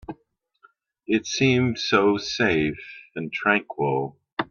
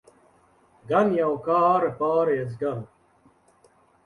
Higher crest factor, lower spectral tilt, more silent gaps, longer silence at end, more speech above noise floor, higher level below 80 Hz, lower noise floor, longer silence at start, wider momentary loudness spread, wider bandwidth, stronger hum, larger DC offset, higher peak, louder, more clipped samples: about the same, 20 dB vs 18 dB; second, -5 dB/octave vs -8.5 dB/octave; first, 4.33-4.37 s vs none; second, 0.05 s vs 1.2 s; first, 43 dB vs 38 dB; first, -58 dBFS vs -66 dBFS; first, -66 dBFS vs -60 dBFS; second, 0.1 s vs 0.85 s; first, 15 LU vs 10 LU; second, 7.2 kHz vs 11 kHz; neither; neither; first, -4 dBFS vs -8 dBFS; about the same, -23 LUFS vs -23 LUFS; neither